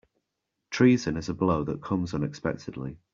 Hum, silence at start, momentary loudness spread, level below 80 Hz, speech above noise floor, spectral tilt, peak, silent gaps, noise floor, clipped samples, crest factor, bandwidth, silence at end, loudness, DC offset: none; 0.7 s; 15 LU; -54 dBFS; 56 dB; -6.5 dB/octave; -8 dBFS; none; -83 dBFS; under 0.1%; 20 dB; 7.6 kHz; 0.2 s; -27 LUFS; under 0.1%